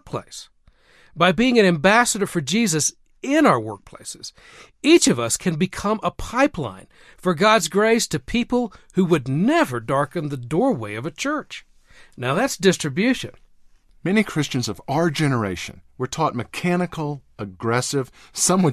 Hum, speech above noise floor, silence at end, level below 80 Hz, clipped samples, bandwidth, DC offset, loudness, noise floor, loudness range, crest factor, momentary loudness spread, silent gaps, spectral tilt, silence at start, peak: none; 33 dB; 0 s; -50 dBFS; under 0.1%; 14 kHz; under 0.1%; -20 LUFS; -54 dBFS; 5 LU; 18 dB; 16 LU; none; -4.5 dB/octave; 0.05 s; -2 dBFS